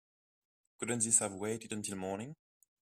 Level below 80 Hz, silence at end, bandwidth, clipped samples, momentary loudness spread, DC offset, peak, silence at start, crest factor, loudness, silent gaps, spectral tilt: -74 dBFS; 0.5 s; 15.5 kHz; under 0.1%; 15 LU; under 0.1%; -12 dBFS; 0.8 s; 28 dB; -34 LUFS; none; -3 dB/octave